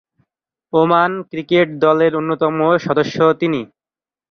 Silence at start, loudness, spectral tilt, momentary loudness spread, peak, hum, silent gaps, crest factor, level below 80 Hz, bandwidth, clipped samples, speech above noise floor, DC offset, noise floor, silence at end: 0.75 s; -16 LUFS; -7 dB/octave; 6 LU; -2 dBFS; none; none; 16 dB; -58 dBFS; 6.6 kHz; under 0.1%; over 75 dB; under 0.1%; under -90 dBFS; 0.65 s